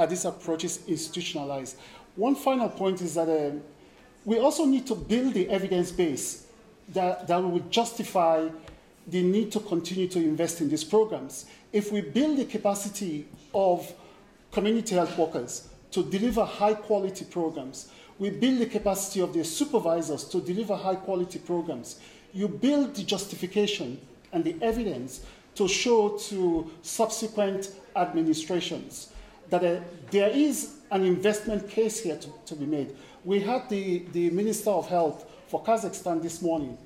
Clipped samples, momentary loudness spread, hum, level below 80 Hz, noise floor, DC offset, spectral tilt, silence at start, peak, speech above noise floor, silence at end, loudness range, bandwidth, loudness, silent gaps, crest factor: under 0.1%; 12 LU; none; -56 dBFS; -54 dBFS; under 0.1%; -4.5 dB/octave; 0 s; -10 dBFS; 27 dB; 0 s; 2 LU; 16 kHz; -28 LUFS; none; 18 dB